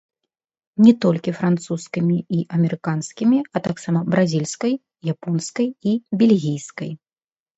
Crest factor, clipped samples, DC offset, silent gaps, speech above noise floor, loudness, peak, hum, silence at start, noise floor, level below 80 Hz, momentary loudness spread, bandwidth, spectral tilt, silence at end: 18 dB; under 0.1%; under 0.1%; none; over 71 dB; -20 LUFS; -2 dBFS; none; 0.8 s; under -90 dBFS; -64 dBFS; 12 LU; 8.2 kHz; -7 dB/octave; 0.6 s